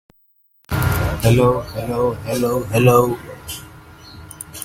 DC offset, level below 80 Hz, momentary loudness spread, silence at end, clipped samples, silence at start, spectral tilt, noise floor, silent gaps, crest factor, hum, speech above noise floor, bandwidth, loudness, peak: under 0.1%; -36 dBFS; 19 LU; 0 s; under 0.1%; 0.7 s; -6 dB/octave; -58 dBFS; none; 20 dB; none; 42 dB; 16.5 kHz; -18 LUFS; 0 dBFS